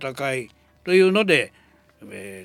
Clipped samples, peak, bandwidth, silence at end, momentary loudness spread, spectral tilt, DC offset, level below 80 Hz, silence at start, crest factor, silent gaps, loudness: under 0.1%; -2 dBFS; 15 kHz; 0 s; 22 LU; -5 dB/octave; under 0.1%; -64 dBFS; 0 s; 20 dB; none; -20 LUFS